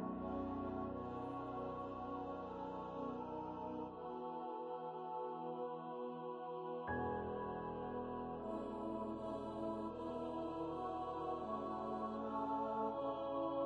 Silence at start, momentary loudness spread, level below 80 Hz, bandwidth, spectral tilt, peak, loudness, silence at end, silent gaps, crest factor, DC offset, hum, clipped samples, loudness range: 0 s; 5 LU; -66 dBFS; 9.6 kHz; -8.5 dB/octave; -30 dBFS; -45 LUFS; 0 s; none; 16 dB; under 0.1%; none; under 0.1%; 3 LU